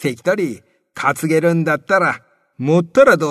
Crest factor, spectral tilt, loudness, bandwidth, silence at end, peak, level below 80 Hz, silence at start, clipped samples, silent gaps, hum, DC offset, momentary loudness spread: 16 dB; -6 dB/octave; -16 LUFS; 13.5 kHz; 0 s; 0 dBFS; -58 dBFS; 0 s; under 0.1%; none; none; under 0.1%; 13 LU